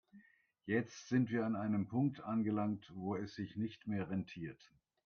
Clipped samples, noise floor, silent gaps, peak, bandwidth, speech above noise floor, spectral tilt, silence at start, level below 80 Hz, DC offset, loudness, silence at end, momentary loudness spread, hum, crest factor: under 0.1%; -68 dBFS; none; -22 dBFS; 6.8 kHz; 30 dB; -7.5 dB/octave; 0.15 s; -76 dBFS; under 0.1%; -39 LUFS; 0.5 s; 9 LU; none; 18 dB